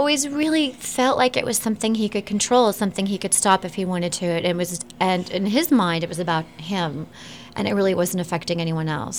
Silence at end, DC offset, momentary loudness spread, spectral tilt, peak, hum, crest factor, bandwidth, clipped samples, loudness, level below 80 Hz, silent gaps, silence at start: 0 s; 0.2%; 8 LU; -4 dB/octave; -4 dBFS; none; 16 dB; 19 kHz; under 0.1%; -21 LUFS; -58 dBFS; none; 0 s